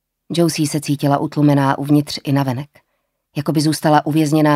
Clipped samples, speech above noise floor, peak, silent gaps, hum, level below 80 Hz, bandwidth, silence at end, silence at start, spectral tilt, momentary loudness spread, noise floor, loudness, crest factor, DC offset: under 0.1%; 52 dB; 0 dBFS; none; none; -60 dBFS; 16 kHz; 0 s; 0.3 s; -6 dB/octave; 10 LU; -68 dBFS; -17 LUFS; 16 dB; under 0.1%